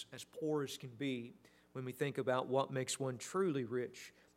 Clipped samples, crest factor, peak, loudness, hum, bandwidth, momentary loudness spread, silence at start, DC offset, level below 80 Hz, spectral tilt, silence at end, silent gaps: under 0.1%; 20 dB; -20 dBFS; -40 LUFS; none; 16 kHz; 12 LU; 0 s; under 0.1%; -84 dBFS; -5 dB/octave; 0.25 s; none